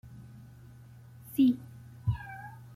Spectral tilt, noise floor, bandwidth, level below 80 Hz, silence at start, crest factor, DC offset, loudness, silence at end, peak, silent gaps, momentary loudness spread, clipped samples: -7.5 dB/octave; -52 dBFS; 15.5 kHz; -54 dBFS; 0.05 s; 18 dB; under 0.1%; -31 LUFS; 0.2 s; -16 dBFS; none; 26 LU; under 0.1%